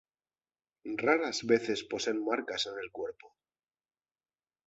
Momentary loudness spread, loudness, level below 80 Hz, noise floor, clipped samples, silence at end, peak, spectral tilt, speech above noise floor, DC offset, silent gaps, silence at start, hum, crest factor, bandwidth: 12 LU; -32 LUFS; -74 dBFS; under -90 dBFS; under 0.1%; 1.4 s; -12 dBFS; -3 dB/octave; over 58 dB; under 0.1%; none; 0.85 s; none; 22 dB; 8 kHz